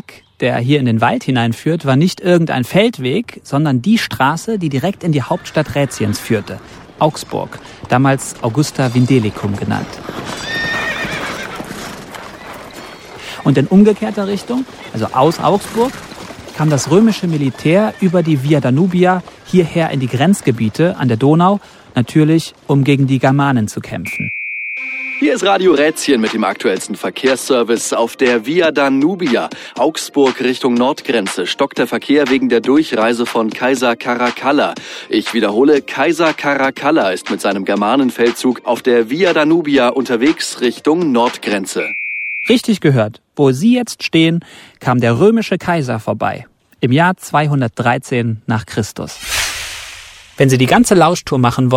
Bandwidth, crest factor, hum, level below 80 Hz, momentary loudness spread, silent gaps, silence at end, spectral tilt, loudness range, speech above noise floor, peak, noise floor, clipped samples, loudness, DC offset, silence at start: 16.5 kHz; 14 dB; none; -48 dBFS; 10 LU; none; 0 s; -5.5 dB/octave; 3 LU; 22 dB; 0 dBFS; -35 dBFS; under 0.1%; -14 LUFS; under 0.1%; 0.1 s